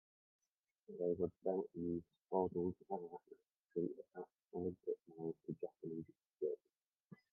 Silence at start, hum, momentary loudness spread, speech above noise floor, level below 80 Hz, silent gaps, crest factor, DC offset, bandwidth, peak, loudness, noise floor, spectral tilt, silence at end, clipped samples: 0.9 s; none; 14 LU; 36 dB; -80 dBFS; 3.57-3.61 s, 7.06-7.10 s; 22 dB; under 0.1%; 2.1 kHz; -24 dBFS; -45 LUFS; -80 dBFS; -8.5 dB/octave; 0.2 s; under 0.1%